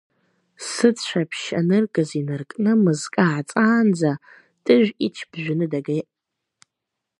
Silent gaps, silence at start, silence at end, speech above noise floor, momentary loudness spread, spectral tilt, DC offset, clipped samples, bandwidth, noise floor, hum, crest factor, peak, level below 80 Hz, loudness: none; 0.6 s; 1.2 s; 62 dB; 11 LU; -6 dB/octave; under 0.1%; under 0.1%; 11.5 kHz; -82 dBFS; none; 20 dB; -2 dBFS; -70 dBFS; -21 LUFS